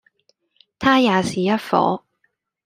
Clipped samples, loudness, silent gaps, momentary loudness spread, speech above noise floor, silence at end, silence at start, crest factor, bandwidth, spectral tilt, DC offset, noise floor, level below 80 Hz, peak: under 0.1%; -19 LUFS; none; 6 LU; 52 dB; 0.65 s; 0.8 s; 20 dB; 15.5 kHz; -5.5 dB/octave; under 0.1%; -69 dBFS; -58 dBFS; -2 dBFS